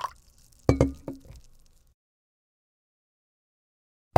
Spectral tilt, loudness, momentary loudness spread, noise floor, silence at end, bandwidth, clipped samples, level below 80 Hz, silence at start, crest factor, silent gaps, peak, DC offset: -7.5 dB/octave; -27 LUFS; 18 LU; -57 dBFS; 2.8 s; 16 kHz; under 0.1%; -44 dBFS; 0 s; 30 dB; none; -2 dBFS; under 0.1%